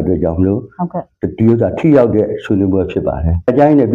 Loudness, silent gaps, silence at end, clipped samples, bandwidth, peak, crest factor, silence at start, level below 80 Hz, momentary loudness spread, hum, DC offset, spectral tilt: -14 LUFS; none; 0 s; under 0.1%; 7.2 kHz; 0 dBFS; 12 dB; 0 s; -30 dBFS; 12 LU; none; under 0.1%; -10.5 dB/octave